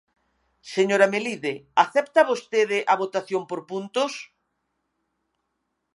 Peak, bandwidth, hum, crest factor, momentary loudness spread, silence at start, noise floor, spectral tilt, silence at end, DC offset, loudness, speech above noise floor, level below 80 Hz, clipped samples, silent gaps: -2 dBFS; 11.5 kHz; none; 22 dB; 11 LU; 0.65 s; -77 dBFS; -4 dB/octave; 1.7 s; under 0.1%; -23 LUFS; 54 dB; -78 dBFS; under 0.1%; none